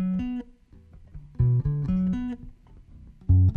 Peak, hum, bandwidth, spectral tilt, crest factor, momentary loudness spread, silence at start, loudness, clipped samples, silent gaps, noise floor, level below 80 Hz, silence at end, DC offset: -10 dBFS; none; 3.4 kHz; -11 dB/octave; 16 dB; 21 LU; 0 s; -26 LUFS; under 0.1%; none; -52 dBFS; -38 dBFS; 0 s; under 0.1%